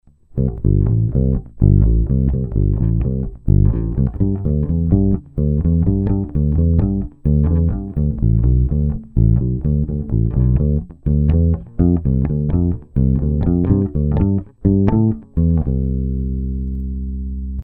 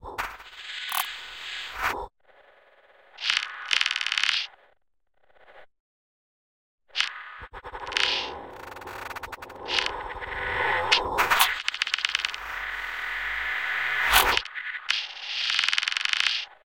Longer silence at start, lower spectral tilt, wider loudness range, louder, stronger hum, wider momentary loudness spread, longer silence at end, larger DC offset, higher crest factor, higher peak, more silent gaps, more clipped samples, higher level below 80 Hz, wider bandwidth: first, 0.35 s vs 0 s; first, -14 dB/octave vs 0 dB/octave; second, 1 LU vs 7 LU; first, -18 LUFS vs -26 LUFS; neither; second, 6 LU vs 16 LU; about the same, 0 s vs 0.1 s; neither; second, 16 dB vs 26 dB; first, 0 dBFS vs -4 dBFS; second, none vs 5.80-6.78 s; neither; first, -22 dBFS vs -50 dBFS; second, 2.7 kHz vs 17 kHz